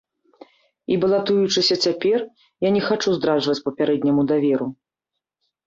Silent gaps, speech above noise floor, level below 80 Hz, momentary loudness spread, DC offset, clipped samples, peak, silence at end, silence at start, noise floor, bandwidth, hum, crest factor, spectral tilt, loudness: none; 64 dB; -62 dBFS; 7 LU; under 0.1%; under 0.1%; -8 dBFS; 0.95 s; 0.9 s; -84 dBFS; 7.8 kHz; none; 14 dB; -5 dB/octave; -20 LUFS